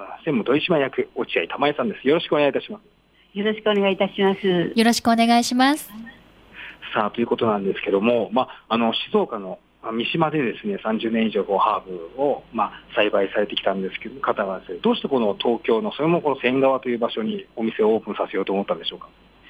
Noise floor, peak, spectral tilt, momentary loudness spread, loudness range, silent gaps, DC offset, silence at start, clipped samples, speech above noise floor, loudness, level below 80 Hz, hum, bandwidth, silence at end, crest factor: -42 dBFS; -4 dBFS; -5 dB/octave; 9 LU; 3 LU; none; under 0.1%; 0 s; under 0.1%; 21 dB; -22 LUFS; -60 dBFS; none; 16 kHz; 0.45 s; 18 dB